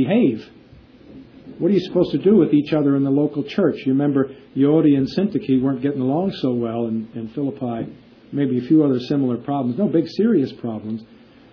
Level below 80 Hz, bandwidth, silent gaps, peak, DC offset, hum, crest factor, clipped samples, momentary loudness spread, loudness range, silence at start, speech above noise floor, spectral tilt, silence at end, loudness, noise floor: -58 dBFS; 5.4 kHz; none; -4 dBFS; under 0.1%; none; 16 dB; under 0.1%; 11 LU; 4 LU; 0 s; 28 dB; -9.5 dB/octave; 0.5 s; -20 LUFS; -46 dBFS